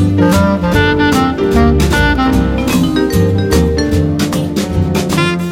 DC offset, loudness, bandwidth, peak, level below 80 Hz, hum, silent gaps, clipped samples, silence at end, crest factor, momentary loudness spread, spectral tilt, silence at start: under 0.1%; -12 LUFS; 17 kHz; 0 dBFS; -22 dBFS; none; none; under 0.1%; 0 s; 12 dB; 4 LU; -6 dB/octave; 0 s